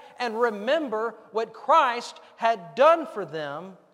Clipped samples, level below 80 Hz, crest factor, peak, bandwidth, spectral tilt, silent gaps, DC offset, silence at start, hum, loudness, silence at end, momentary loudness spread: under 0.1%; -86 dBFS; 18 dB; -6 dBFS; 11.5 kHz; -4 dB/octave; none; under 0.1%; 0.05 s; none; -24 LUFS; 0.2 s; 14 LU